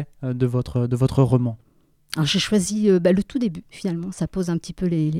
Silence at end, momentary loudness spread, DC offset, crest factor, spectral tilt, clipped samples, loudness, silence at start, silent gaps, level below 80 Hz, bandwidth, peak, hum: 0 s; 10 LU; under 0.1%; 16 dB; -6 dB/octave; under 0.1%; -22 LUFS; 0 s; none; -46 dBFS; 14.5 kHz; -6 dBFS; none